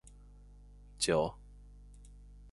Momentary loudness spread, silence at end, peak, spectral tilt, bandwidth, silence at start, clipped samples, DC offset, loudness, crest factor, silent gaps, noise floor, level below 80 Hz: 27 LU; 0 s; -16 dBFS; -3.5 dB/octave; 11.5 kHz; 0.05 s; under 0.1%; under 0.1%; -33 LUFS; 22 dB; none; -55 dBFS; -54 dBFS